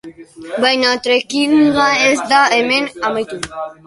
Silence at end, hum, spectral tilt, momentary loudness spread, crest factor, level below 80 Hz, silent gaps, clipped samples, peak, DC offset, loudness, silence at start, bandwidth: 0.15 s; none; -2.5 dB/octave; 12 LU; 14 dB; -52 dBFS; none; under 0.1%; 0 dBFS; under 0.1%; -14 LUFS; 0.05 s; 11.5 kHz